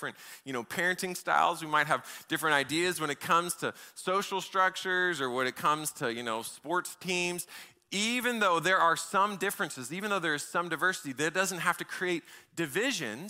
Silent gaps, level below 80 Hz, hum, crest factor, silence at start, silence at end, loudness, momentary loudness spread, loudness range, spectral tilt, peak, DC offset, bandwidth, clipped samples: none; -76 dBFS; none; 20 dB; 0 s; 0 s; -30 LUFS; 9 LU; 3 LU; -3 dB/octave; -12 dBFS; under 0.1%; 16 kHz; under 0.1%